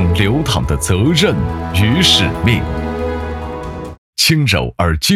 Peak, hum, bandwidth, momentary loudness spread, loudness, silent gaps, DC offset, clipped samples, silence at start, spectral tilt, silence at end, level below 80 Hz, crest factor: 0 dBFS; none; 16 kHz; 14 LU; -14 LUFS; 3.98-4.13 s; under 0.1%; under 0.1%; 0 s; -4.5 dB/octave; 0 s; -30 dBFS; 14 dB